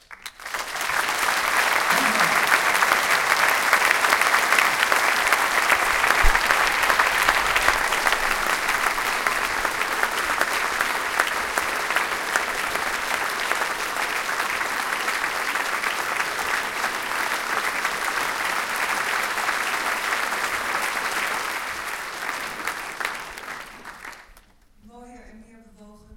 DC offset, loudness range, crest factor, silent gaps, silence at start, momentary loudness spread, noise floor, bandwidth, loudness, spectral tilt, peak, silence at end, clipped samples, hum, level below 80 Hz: under 0.1%; 9 LU; 22 dB; none; 0.1 s; 10 LU; -53 dBFS; 17 kHz; -21 LUFS; -0.5 dB/octave; 0 dBFS; 0 s; under 0.1%; none; -40 dBFS